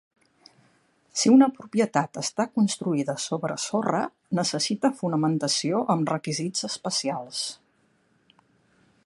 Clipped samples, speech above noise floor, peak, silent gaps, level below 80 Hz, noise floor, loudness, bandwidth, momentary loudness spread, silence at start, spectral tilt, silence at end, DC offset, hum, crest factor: under 0.1%; 41 dB; -6 dBFS; none; -74 dBFS; -66 dBFS; -25 LUFS; 11.5 kHz; 9 LU; 1.15 s; -4.5 dB/octave; 1.5 s; under 0.1%; none; 20 dB